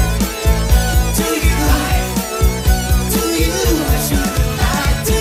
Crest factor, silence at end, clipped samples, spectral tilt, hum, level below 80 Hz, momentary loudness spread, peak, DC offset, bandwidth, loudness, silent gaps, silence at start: 14 dB; 0 s; under 0.1%; -4.5 dB/octave; none; -18 dBFS; 3 LU; -2 dBFS; under 0.1%; 16.5 kHz; -16 LUFS; none; 0 s